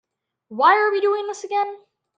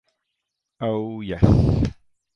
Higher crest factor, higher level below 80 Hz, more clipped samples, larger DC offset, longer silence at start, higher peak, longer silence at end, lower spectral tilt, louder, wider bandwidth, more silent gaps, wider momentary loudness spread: about the same, 20 dB vs 22 dB; second, -80 dBFS vs -32 dBFS; neither; neither; second, 0.5 s vs 0.8 s; about the same, -2 dBFS vs 0 dBFS; about the same, 0.4 s vs 0.45 s; second, -2.5 dB/octave vs -9.5 dB/octave; about the same, -20 LUFS vs -22 LUFS; first, 8.8 kHz vs 7 kHz; neither; about the same, 12 LU vs 12 LU